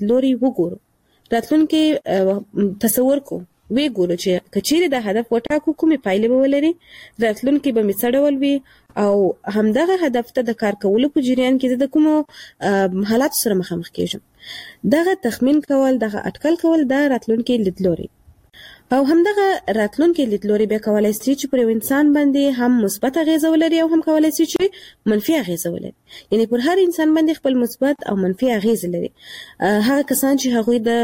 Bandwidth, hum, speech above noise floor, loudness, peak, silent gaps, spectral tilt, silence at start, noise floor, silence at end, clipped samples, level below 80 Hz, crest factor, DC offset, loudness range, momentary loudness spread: 16.5 kHz; none; 28 dB; -18 LUFS; -2 dBFS; none; -5 dB/octave; 0 s; -45 dBFS; 0 s; under 0.1%; -54 dBFS; 14 dB; under 0.1%; 2 LU; 8 LU